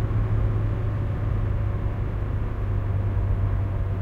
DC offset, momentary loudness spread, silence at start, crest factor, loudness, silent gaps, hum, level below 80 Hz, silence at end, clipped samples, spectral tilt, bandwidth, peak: under 0.1%; 4 LU; 0 s; 10 dB; -26 LUFS; none; none; -28 dBFS; 0 s; under 0.1%; -10 dB/octave; 3.9 kHz; -12 dBFS